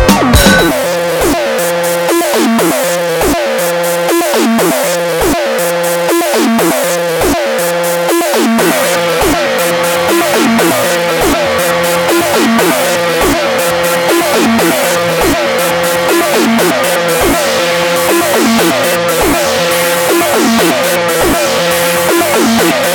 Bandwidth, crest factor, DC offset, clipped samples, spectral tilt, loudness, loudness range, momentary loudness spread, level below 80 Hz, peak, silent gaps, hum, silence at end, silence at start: 19.5 kHz; 10 dB; under 0.1%; under 0.1%; -3.5 dB/octave; -10 LUFS; 2 LU; 3 LU; -30 dBFS; 0 dBFS; none; none; 0 s; 0 s